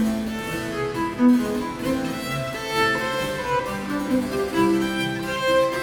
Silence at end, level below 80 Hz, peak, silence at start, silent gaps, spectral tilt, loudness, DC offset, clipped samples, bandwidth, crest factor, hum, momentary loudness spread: 0 s; -46 dBFS; -8 dBFS; 0 s; none; -5 dB/octave; -23 LUFS; under 0.1%; under 0.1%; 19.5 kHz; 16 dB; none; 7 LU